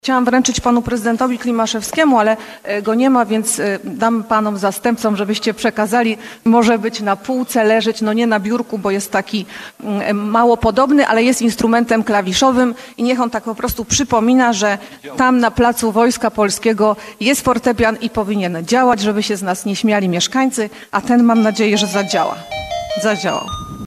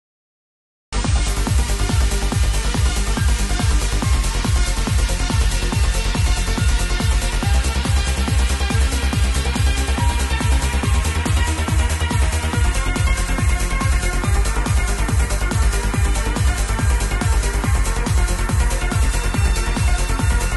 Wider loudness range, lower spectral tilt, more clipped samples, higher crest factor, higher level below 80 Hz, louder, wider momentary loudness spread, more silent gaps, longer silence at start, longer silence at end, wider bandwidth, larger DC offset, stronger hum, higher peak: about the same, 2 LU vs 1 LU; about the same, -4 dB/octave vs -4.5 dB/octave; neither; about the same, 14 dB vs 12 dB; second, -42 dBFS vs -20 dBFS; first, -15 LUFS vs -20 LUFS; first, 8 LU vs 1 LU; neither; second, 0.05 s vs 0.9 s; about the same, 0 s vs 0 s; first, 14.5 kHz vs 12.5 kHz; neither; neither; first, -2 dBFS vs -6 dBFS